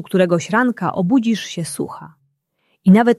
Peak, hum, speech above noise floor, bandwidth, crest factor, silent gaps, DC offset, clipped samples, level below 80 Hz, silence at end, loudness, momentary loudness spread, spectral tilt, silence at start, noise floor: -2 dBFS; none; 50 dB; 12.5 kHz; 14 dB; none; under 0.1%; under 0.1%; -62 dBFS; 0.05 s; -18 LUFS; 12 LU; -6.5 dB/octave; 0 s; -67 dBFS